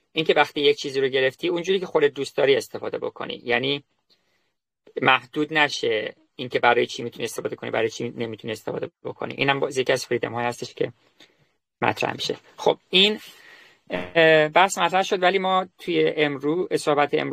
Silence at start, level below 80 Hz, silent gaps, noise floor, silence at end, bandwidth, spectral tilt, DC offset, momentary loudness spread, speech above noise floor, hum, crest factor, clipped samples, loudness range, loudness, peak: 0.15 s; -66 dBFS; none; -75 dBFS; 0 s; 15 kHz; -4 dB/octave; under 0.1%; 12 LU; 52 dB; none; 20 dB; under 0.1%; 6 LU; -22 LUFS; -4 dBFS